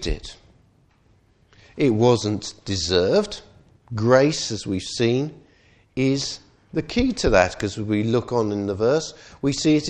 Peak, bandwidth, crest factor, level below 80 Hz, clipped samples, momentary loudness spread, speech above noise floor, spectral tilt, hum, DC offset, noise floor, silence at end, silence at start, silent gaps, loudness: -2 dBFS; 10 kHz; 20 dB; -40 dBFS; under 0.1%; 14 LU; 38 dB; -5 dB/octave; none; under 0.1%; -59 dBFS; 0 s; 0 s; none; -22 LUFS